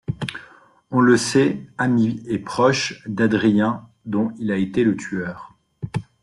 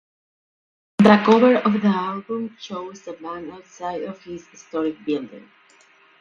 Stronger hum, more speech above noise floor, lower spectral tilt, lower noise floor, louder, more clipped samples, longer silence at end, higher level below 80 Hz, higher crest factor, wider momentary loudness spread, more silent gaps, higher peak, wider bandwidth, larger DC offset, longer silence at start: neither; about the same, 30 dB vs 33 dB; second, -5.5 dB/octave vs -7 dB/octave; second, -49 dBFS vs -54 dBFS; about the same, -21 LUFS vs -19 LUFS; neither; second, 0.2 s vs 0.8 s; first, -56 dBFS vs -64 dBFS; about the same, 18 dB vs 22 dB; second, 14 LU vs 21 LU; neither; about the same, -2 dBFS vs 0 dBFS; first, 12 kHz vs 7.2 kHz; neither; second, 0.1 s vs 1 s